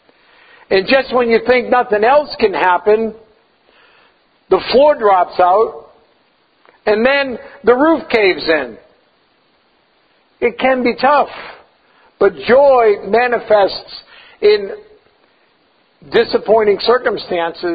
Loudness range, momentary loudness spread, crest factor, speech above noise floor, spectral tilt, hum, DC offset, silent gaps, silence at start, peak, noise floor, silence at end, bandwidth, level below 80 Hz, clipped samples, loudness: 4 LU; 9 LU; 14 dB; 44 dB; -7 dB/octave; none; under 0.1%; none; 0.7 s; 0 dBFS; -56 dBFS; 0 s; 5 kHz; -50 dBFS; under 0.1%; -13 LUFS